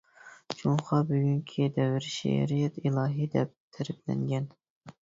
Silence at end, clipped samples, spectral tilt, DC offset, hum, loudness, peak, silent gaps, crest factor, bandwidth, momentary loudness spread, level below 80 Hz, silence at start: 0.1 s; under 0.1%; -7 dB/octave; under 0.1%; none; -30 LUFS; -12 dBFS; 3.57-3.71 s, 4.70-4.81 s; 18 dB; 7.8 kHz; 9 LU; -64 dBFS; 0.25 s